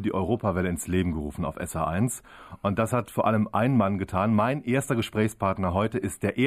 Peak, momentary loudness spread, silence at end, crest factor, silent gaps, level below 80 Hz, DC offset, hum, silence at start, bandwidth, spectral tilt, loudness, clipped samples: -10 dBFS; 7 LU; 0 s; 16 dB; none; -48 dBFS; under 0.1%; none; 0 s; 15.5 kHz; -6.5 dB/octave; -26 LUFS; under 0.1%